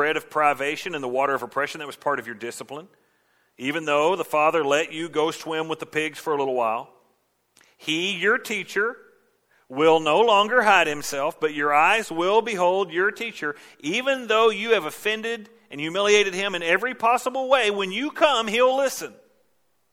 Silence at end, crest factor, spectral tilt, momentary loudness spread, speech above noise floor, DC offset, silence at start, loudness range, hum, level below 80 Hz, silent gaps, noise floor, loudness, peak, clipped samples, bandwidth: 0.85 s; 20 dB; -3 dB/octave; 13 LU; 48 dB; under 0.1%; 0 s; 7 LU; none; -70 dBFS; none; -70 dBFS; -22 LUFS; -2 dBFS; under 0.1%; 17 kHz